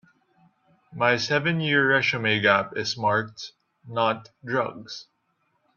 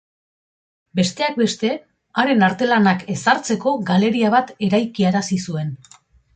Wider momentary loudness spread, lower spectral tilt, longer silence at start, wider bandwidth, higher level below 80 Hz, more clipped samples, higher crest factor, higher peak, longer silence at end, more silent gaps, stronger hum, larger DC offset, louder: first, 19 LU vs 10 LU; about the same, -5 dB/octave vs -5.5 dB/octave; about the same, 0.9 s vs 0.95 s; second, 7.4 kHz vs 9.2 kHz; second, -68 dBFS vs -60 dBFS; neither; first, 22 dB vs 16 dB; about the same, -4 dBFS vs -2 dBFS; first, 0.75 s vs 0.6 s; neither; neither; neither; second, -23 LUFS vs -19 LUFS